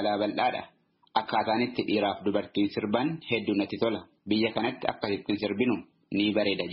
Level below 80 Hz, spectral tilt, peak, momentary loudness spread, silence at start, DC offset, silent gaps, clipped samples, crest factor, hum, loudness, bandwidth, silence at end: -66 dBFS; -3.5 dB/octave; -8 dBFS; 5 LU; 0 s; under 0.1%; none; under 0.1%; 20 dB; none; -29 LUFS; 5.8 kHz; 0 s